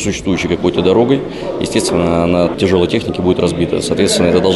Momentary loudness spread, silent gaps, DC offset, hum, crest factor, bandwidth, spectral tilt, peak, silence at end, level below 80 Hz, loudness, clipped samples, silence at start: 5 LU; none; under 0.1%; none; 12 dB; 12 kHz; -5 dB/octave; 0 dBFS; 0 s; -36 dBFS; -14 LUFS; under 0.1%; 0 s